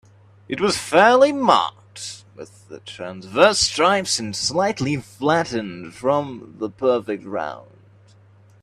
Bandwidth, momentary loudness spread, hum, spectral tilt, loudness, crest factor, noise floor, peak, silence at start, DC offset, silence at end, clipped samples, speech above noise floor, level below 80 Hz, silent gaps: 14 kHz; 19 LU; none; -3.5 dB/octave; -19 LUFS; 20 dB; -51 dBFS; 0 dBFS; 0.5 s; under 0.1%; 1 s; under 0.1%; 31 dB; -56 dBFS; none